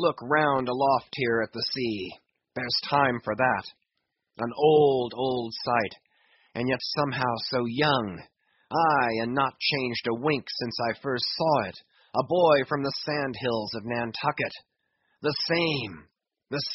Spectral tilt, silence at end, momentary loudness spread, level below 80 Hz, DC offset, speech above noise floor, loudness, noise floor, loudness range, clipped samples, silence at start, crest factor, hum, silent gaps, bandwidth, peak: -3 dB/octave; 0 s; 11 LU; -64 dBFS; under 0.1%; 55 dB; -26 LUFS; -81 dBFS; 3 LU; under 0.1%; 0 s; 20 dB; none; none; 6 kHz; -8 dBFS